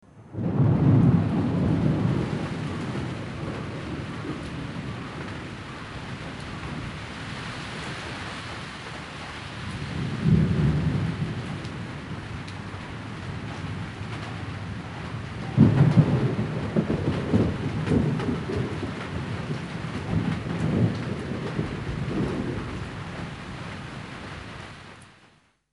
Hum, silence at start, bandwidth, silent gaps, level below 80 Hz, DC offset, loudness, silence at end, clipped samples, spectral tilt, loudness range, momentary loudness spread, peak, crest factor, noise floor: none; 0.15 s; 11.5 kHz; none; -44 dBFS; under 0.1%; -28 LUFS; 0.6 s; under 0.1%; -7.5 dB/octave; 11 LU; 15 LU; -4 dBFS; 22 dB; -59 dBFS